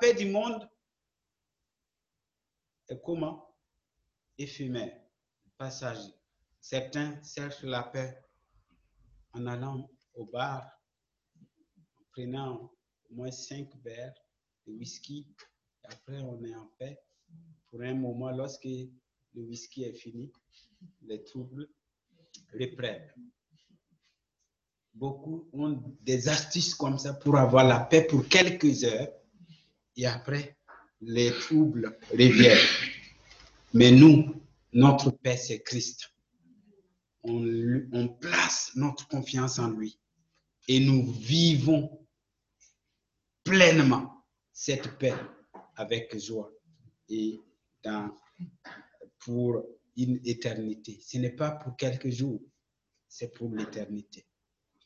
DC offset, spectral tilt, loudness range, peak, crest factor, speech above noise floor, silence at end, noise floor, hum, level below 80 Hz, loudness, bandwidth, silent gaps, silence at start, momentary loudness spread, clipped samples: under 0.1%; -5 dB/octave; 22 LU; -4 dBFS; 26 dB; 62 dB; 0.85 s; -88 dBFS; none; -64 dBFS; -25 LUFS; 7.8 kHz; none; 0 s; 24 LU; under 0.1%